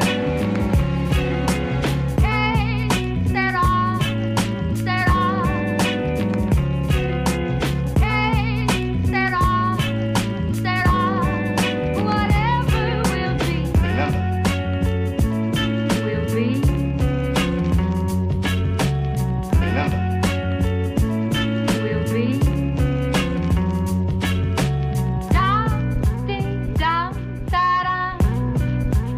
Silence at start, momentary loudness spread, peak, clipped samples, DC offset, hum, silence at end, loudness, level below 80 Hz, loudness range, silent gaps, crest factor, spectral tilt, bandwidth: 0 s; 3 LU; -8 dBFS; under 0.1%; under 0.1%; none; 0 s; -21 LUFS; -28 dBFS; 1 LU; none; 12 dB; -6 dB/octave; 15.5 kHz